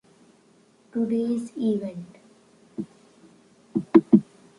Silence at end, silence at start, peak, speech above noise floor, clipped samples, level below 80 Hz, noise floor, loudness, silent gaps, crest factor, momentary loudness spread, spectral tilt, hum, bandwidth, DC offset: 0.35 s; 0.95 s; -2 dBFS; 32 dB; under 0.1%; -68 dBFS; -59 dBFS; -24 LUFS; none; 24 dB; 22 LU; -8.5 dB/octave; none; 11 kHz; under 0.1%